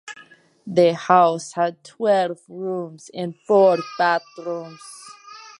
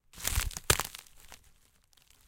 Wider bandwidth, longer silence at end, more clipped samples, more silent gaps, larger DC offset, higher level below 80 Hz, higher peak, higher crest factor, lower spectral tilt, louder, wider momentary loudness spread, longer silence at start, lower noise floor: second, 11.5 kHz vs 17 kHz; second, 0.1 s vs 0.9 s; neither; neither; neither; second, -76 dBFS vs -42 dBFS; first, -2 dBFS vs -6 dBFS; second, 20 dB vs 30 dB; first, -5.5 dB/octave vs -2 dB/octave; first, -20 LUFS vs -31 LUFS; about the same, 23 LU vs 24 LU; about the same, 0.05 s vs 0.15 s; second, -50 dBFS vs -65 dBFS